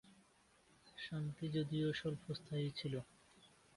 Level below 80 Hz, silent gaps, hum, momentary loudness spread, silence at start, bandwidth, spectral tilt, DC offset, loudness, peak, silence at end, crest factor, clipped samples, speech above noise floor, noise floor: -72 dBFS; none; none; 11 LU; 0.05 s; 11.5 kHz; -7 dB/octave; under 0.1%; -43 LUFS; -30 dBFS; 0.3 s; 14 dB; under 0.1%; 30 dB; -72 dBFS